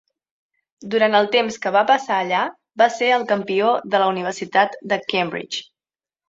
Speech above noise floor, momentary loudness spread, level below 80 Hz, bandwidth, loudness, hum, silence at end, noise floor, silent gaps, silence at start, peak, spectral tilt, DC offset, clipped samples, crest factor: over 71 dB; 8 LU; -68 dBFS; 8 kHz; -19 LUFS; none; 0.65 s; under -90 dBFS; none; 0.8 s; -2 dBFS; -4 dB/octave; under 0.1%; under 0.1%; 18 dB